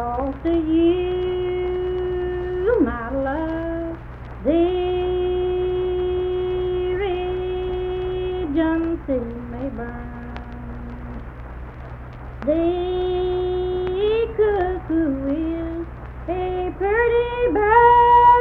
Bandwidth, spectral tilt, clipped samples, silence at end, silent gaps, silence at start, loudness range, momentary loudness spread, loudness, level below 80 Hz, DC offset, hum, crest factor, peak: 4.3 kHz; -9.5 dB/octave; under 0.1%; 0 s; none; 0 s; 5 LU; 16 LU; -21 LUFS; -34 dBFS; under 0.1%; none; 18 dB; -2 dBFS